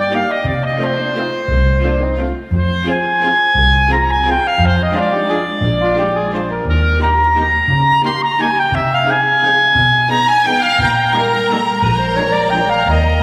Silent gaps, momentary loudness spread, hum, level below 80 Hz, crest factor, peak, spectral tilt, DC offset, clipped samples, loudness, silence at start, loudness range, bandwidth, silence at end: none; 6 LU; none; -24 dBFS; 12 dB; -2 dBFS; -6 dB/octave; under 0.1%; under 0.1%; -15 LUFS; 0 s; 2 LU; 11 kHz; 0 s